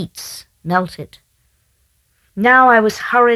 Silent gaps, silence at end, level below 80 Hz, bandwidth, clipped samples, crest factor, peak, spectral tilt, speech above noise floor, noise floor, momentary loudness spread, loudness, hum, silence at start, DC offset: none; 0 s; -56 dBFS; 14 kHz; under 0.1%; 16 dB; 0 dBFS; -5 dB/octave; 47 dB; -61 dBFS; 24 LU; -13 LUFS; none; 0 s; under 0.1%